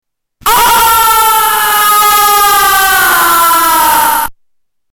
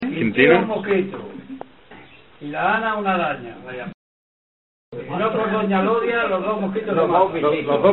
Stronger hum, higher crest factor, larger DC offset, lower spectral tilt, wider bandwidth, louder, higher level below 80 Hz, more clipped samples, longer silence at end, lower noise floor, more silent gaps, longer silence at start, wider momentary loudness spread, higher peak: neither; second, 6 dB vs 20 dB; second, under 0.1% vs 0.2%; second, 0.5 dB/octave vs -9 dB/octave; first, 19 kHz vs 4.2 kHz; first, -7 LUFS vs -20 LUFS; first, -36 dBFS vs -56 dBFS; neither; first, 0.6 s vs 0 s; first, -61 dBFS vs -45 dBFS; second, none vs 3.94-4.92 s; first, 0.45 s vs 0 s; second, 4 LU vs 19 LU; about the same, -2 dBFS vs 0 dBFS